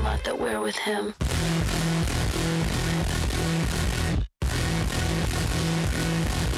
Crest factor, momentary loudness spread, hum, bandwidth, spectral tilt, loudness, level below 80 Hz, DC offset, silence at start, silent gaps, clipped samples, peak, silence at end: 14 dB; 2 LU; none; 15.5 kHz; -5 dB/octave; -26 LUFS; -32 dBFS; under 0.1%; 0 s; none; under 0.1%; -12 dBFS; 0 s